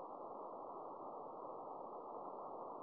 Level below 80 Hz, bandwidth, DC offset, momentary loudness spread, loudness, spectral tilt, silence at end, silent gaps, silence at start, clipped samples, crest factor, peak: -90 dBFS; 4.8 kHz; under 0.1%; 1 LU; -51 LUFS; -8.5 dB/octave; 0 s; none; 0 s; under 0.1%; 12 dB; -38 dBFS